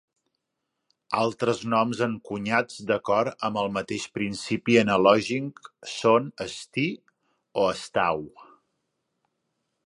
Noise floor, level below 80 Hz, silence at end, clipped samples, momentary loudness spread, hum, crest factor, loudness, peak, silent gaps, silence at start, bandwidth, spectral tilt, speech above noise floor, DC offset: -81 dBFS; -64 dBFS; 1.4 s; under 0.1%; 13 LU; none; 22 dB; -25 LUFS; -4 dBFS; none; 1.1 s; 11.5 kHz; -5 dB/octave; 56 dB; under 0.1%